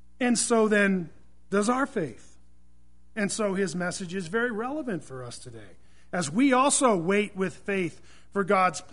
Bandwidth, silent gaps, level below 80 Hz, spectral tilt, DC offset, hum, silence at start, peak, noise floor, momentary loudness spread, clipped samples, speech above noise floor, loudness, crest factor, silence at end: 11 kHz; none; -60 dBFS; -4 dB/octave; 0.5%; none; 0.2 s; -8 dBFS; -61 dBFS; 15 LU; under 0.1%; 34 dB; -26 LUFS; 18 dB; 0.1 s